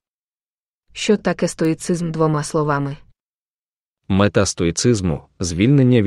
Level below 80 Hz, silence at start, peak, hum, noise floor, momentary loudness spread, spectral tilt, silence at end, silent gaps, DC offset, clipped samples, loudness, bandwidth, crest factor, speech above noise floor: -44 dBFS; 0.95 s; -2 dBFS; none; under -90 dBFS; 9 LU; -5.5 dB/octave; 0 s; 3.23-3.96 s; under 0.1%; under 0.1%; -19 LUFS; 12 kHz; 18 dB; over 73 dB